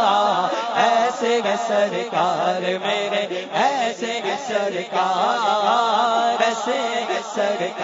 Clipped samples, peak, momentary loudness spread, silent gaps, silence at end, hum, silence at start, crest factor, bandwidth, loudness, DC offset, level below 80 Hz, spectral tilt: under 0.1%; -4 dBFS; 5 LU; none; 0 s; none; 0 s; 16 dB; 7.8 kHz; -20 LUFS; under 0.1%; -74 dBFS; -3 dB/octave